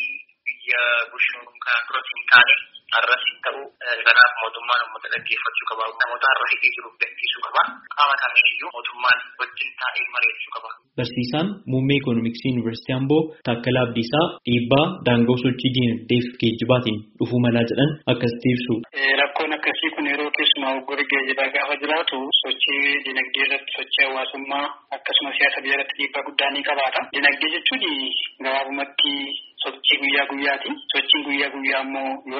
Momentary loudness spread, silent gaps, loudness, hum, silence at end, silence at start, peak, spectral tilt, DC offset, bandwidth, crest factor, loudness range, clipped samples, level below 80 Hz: 9 LU; none; -20 LUFS; none; 0 s; 0 s; 0 dBFS; -2 dB/octave; under 0.1%; 5.8 kHz; 22 dB; 4 LU; under 0.1%; -60 dBFS